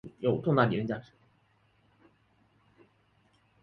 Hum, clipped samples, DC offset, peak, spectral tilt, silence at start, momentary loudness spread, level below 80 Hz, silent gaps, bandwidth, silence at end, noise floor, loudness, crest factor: none; under 0.1%; under 0.1%; -10 dBFS; -9.5 dB/octave; 0.05 s; 11 LU; -66 dBFS; none; 6 kHz; 2.6 s; -68 dBFS; -29 LUFS; 24 dB